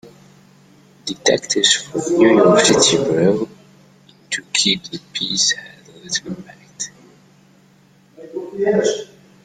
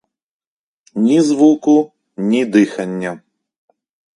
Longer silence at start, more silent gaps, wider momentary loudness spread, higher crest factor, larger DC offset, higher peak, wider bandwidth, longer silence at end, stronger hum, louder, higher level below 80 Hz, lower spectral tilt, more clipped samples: about the same, 1.05 s vs 0.95 s; neither; first, 18 LU vs 15 LU; about the same, 18 dB vs 16 dB; neither; about the same, 0 dBFS vs 0 dBFS; first, 13 kHz vs 11.5 kHz; second, 0.4 s vs 1 s; neither; about the same, -16 LUFS vs -15 LUFS; first, -58 dBFS vs -64 dBFS; second, -3 dB/octave vs -6 dB/octave; neither